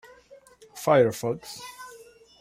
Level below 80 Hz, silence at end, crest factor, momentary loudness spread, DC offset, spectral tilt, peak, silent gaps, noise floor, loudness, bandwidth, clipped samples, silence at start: -66 dBFS; 0.55 s; 20 dB; 24 LU; under 0.1%; -5.5 dB/octave; -8 dBFS; none; -53 dBFS; -24 LUFS; 16 kHz; under 0.1%; 0.75 s